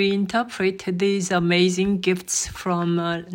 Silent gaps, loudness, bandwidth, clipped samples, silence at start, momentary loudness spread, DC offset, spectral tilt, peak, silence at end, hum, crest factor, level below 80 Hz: none; -22 LUFS; 16.5 kHz; under 0.1%; 0 s; 6 LU; under 0.1%; -4.5 dB/octave; -8 dBFS; 0 s; none; 14 dB; -52 dBFS